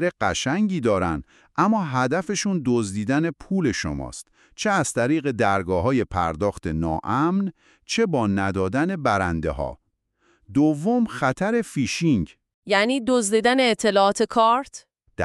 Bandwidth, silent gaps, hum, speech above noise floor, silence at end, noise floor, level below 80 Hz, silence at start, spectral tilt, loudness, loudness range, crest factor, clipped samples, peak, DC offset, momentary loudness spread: 12.5 kHz; 12.54-12.62 s; none; 44 dB; 0 s; -66 dBFS; -46 dBFS; 0 s; -5 dB/octave; -22 LUFS; 3 LU; 18 dB; under 0.1%; -4 dBFS; under 0.1%; 8 LU